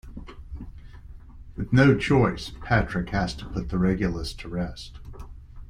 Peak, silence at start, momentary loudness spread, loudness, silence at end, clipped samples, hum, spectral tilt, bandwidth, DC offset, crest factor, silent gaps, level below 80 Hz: -4 dBFS; 0.05 s; 24 LU; -25 LUFS; 0 s; under 0.1%; none; -7 dB/octave; 11.5 kHz; under 0.1%; 22 dB; none; -38 dBFS